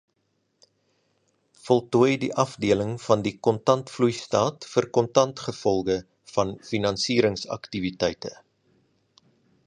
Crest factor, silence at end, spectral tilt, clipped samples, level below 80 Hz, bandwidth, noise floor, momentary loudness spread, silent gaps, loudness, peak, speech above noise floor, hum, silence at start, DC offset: 24 dB; 1.35 s; -5.5 dB/octave; under 0.1%; -56 dBFS; 10.5 kHz; -73 dBFS; 8 LU; none; -24 LUFS; -2 dBFS; 49 dB; none; 1.65 s; under 0.1%